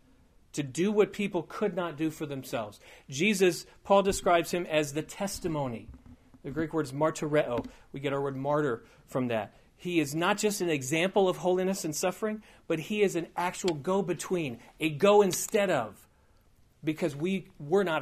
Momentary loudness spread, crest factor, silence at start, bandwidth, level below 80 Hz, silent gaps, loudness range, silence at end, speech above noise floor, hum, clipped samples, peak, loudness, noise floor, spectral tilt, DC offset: 12 LU; 22 dB; 0.55 s; 15.5 kHz; -58 dBFS; none; 3 LU; 0 s; 33 dB; none; under 0.1%; -8 dBFS; -29 LUFS; -63 dBFS; -4.5 dB/octave; under 0.1%